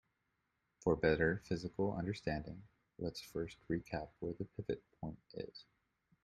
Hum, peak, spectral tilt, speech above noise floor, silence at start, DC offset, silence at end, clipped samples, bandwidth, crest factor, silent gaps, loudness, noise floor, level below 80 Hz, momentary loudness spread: none; -18 dBFS; -7 dB/octave; 44 dB; 0.85 s; under 0.1%; 0.6 s; under 0.1%; 13 kHz; 24 dB; none; -41 LUFS; -84 dBFS; -60 dBFS; 15 LU